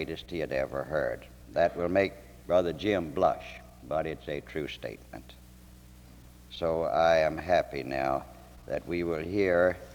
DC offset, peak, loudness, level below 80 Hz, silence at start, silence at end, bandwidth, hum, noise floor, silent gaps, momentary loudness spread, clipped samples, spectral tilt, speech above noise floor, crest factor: under 0.1%; -12 dBFS; -30 LUFS; -52 dBFS; 0 s; 0 s; 19.5 kHz; none; -52 dBFS; none; 18 LU; under 0.1%; -6 dB/octave; 23 dB; 20 dB